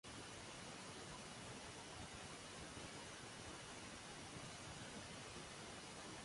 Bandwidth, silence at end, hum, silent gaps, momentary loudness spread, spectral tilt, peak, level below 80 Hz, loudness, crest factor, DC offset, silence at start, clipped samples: 11.5 kHz; 0 s; none; none; 1 LU; -3 dB/octave; -40 dBFS; -70 dBFS; -53 LUFS; 14 dB; under 0.1%; 0.05 s; under 0.1%